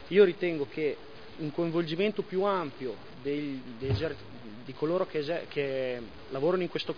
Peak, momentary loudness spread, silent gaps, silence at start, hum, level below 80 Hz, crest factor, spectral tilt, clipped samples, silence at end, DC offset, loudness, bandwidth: -10 dBFS; 11 LU; none; 0 s; none; -58 dBFS; 20 dB; -8 dB/octave; under 0.1%; 0 s; 0.4%; -31 LUFS; 5.4 kHz